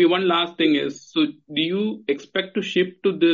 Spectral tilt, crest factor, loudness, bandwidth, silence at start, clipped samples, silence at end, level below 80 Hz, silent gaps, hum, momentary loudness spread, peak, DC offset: -3 dB/octave; 14 dB; -22 LUFS; 7.4 kHz; 0 s; under 0.1%; 0 s; -70 dBFS; none; none; 6 LU; -6 dBFS; under 0.1%